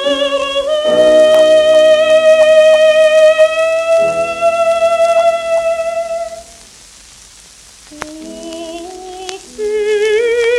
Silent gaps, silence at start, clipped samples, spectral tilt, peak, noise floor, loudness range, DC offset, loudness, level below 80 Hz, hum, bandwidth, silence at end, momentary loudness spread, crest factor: none; 0 s; under 0.1%; -2 dB/octave; 0 dBFS; -39 dBFS; 18 LU; under 0.1%; -10 LUFS; -48 dBFS; none; 12.5 kHz; 0 s; 19 LU; 12 dB